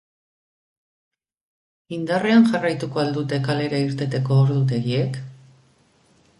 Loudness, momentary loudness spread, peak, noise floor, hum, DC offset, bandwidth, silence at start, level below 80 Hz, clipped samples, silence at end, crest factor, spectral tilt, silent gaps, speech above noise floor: -21 LUFS; 13 LU; -4 dBFS; -59 dBFS; none; under 0.1%; 11.5 kHz; 1.9 s; -62 dBFS; under 0.1%; 1.05 s; 18 dB; -7.5 dB/octave; none; 39 dB